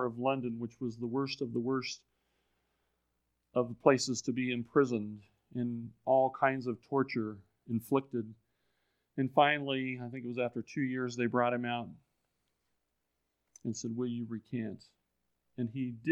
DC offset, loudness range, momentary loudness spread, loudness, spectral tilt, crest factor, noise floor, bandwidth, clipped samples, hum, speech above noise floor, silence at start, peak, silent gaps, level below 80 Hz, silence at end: under 0.1%; 8 LU; 14 LU; -34 LUFS; -5.5 dB/octave; 26 dB; -83 dBFS; 14.5 kHz; under 0.1%; none; 50 dB; 0 s; -8 dBFS; none; -78 dBFS; 0 s